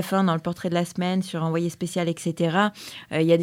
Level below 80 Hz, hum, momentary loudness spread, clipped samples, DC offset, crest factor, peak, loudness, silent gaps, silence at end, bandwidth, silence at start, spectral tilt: -64 dBFS; none; 5 LU; under 0.1%; under 0.1%; 18 dB; -6 dBFS; -25 LUFS; none; 0 s; 16 kHz; 0 s; -6 dB/octave